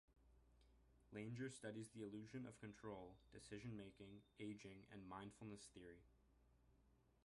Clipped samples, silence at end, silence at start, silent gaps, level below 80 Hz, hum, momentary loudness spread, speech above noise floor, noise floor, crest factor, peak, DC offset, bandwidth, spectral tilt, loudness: under 0.1%; 0.05 s; 0.1 s; none; -76 dBFS; none; 11 LU; 21 dB; -78 dBFS; 18 dB; -40 dBFS; under 0.1%; 11.5 kHz; -5.5 dB/octave; -57 LUFS